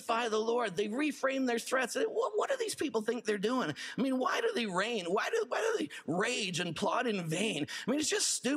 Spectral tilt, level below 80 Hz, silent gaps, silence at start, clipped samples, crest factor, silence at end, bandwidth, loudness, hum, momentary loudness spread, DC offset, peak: -3 dB/octave; -78 dBFS; none; 0 s; under 0.1%; 16 dB; 0 s; 15.5 kHz; -33 LUFS; none; 3 LU; under 0.1%; -18 dBFS